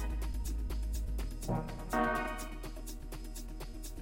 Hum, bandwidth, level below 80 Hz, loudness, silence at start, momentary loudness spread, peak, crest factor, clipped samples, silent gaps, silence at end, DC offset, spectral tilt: none; 16.5 kHz; -40 dBFS; -39 LUFS; 0 s; 12 LU; -20 dBFS; 18 dB; under 0.1%; none; 0 s; under 0.1%; -5.5 dB/octave